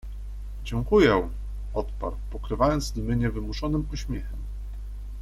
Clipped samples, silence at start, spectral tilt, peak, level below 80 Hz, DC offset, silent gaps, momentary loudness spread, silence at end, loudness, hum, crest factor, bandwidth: under 0.1%; 0.05 s; -6.5 dB/octave; -8 dBFS; -34 dBFS; under 0.1%; none; 18 LU; 0 s; -27 LUFS; 50 Hz at -35 dBFS; 20 dB; 13.5 kHz